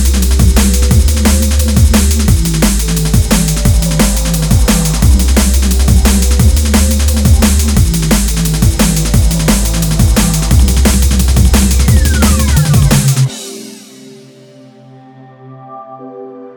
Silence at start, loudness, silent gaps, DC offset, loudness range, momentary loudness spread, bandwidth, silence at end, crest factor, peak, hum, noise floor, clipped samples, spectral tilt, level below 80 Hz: 0 s; -10 LUFS; none; under 0.1%; 3 LU; 4 LU; over 20 kHz; 0.05 s; 10 dB; 0 dBFS; none; -37 dBFS; under 0.1%; -5 dB/octave; -12 dBFS